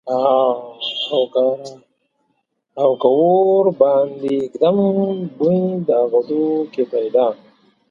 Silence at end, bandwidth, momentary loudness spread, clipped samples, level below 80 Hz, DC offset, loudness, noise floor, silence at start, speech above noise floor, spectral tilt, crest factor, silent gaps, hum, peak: 0.55 s; 7.4 kHz; 9 LU; under 0.1%; -68 dBFS; under 0.1%; -17 LUFS; -69 dBFS; 0.05 s; 52 dB; -8 dB/octave; 16 dB; none; none; 0 dBFS